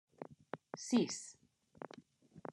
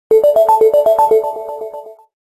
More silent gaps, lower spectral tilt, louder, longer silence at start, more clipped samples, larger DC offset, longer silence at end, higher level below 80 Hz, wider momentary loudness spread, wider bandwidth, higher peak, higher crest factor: neither; about the same, -4 dB/octave vs -4.5 dB/octave; second, -39 LUFS vs -11 LUFS; about the same, 0.2 s vs 0.1 s; neither; neither; second, 0 s vs 0.3 s; second, -86 dBFS vs -56 dBFS; first, 20 LU vs 17 LU; second, 12 kHz vs 14 kHz; second, -22 dBFS vs -2 dBFS; first, 20 dB vs 10 dB